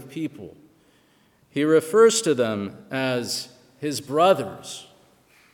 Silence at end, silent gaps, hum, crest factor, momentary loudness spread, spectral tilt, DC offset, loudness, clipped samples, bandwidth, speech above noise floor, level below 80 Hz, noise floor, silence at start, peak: 0.7 s; none; none; 20 dB; 20 LU; -4 dB/octave; under 0.1%; -22 LUFS; under 0.1%; 18 kHz; 38 dB; -72 dBFS; -60 dBFS; 0 s; -4 dBFS